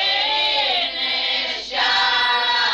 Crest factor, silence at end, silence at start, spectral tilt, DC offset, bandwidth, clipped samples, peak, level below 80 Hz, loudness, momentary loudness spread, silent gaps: 12 dB; 0 s; 0 s; 0 dB/octave; under 0.1%; 12.5 kHz; under 0.1%; -8 dBFS; -54 dBFS; -18 LUFS; 4 LU; none